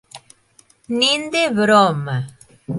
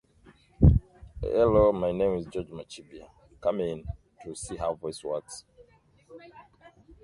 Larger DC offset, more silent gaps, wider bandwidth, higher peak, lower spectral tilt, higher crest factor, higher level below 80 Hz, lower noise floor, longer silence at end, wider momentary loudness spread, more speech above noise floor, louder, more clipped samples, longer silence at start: neither; neither; about the same, 11.5 kHz vs 11.5 kHz; about the same, -2 dBFS vs -4 dBFS; second, -4.5 dB/octave vs -7.5 dB/octave; second, 18 dB vs 24 dB; second, -60 dBFS vs -36 dBFS; second, -55 dBFS vs -60 dBFS; second, 0 s vs 0.6 s; second, 13 LU vs 22 LU; first, 38 dB vs 31 dB; first, -17 LUFS vs -27 LUFS; neither; second, 0.15 s vs 0.6 s